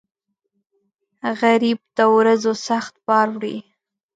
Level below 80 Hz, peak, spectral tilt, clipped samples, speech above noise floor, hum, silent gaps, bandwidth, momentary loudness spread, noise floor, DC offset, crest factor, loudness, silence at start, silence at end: -72 dBFS; -4 dBFS; -4.5 dB/octave; under 0.1%; 55 dB; none; none; 9 kHz; 13 LU; -73 dBFS; under 0.1%; 18 dB; -18 LUFS; 1.25 s; 0.55 s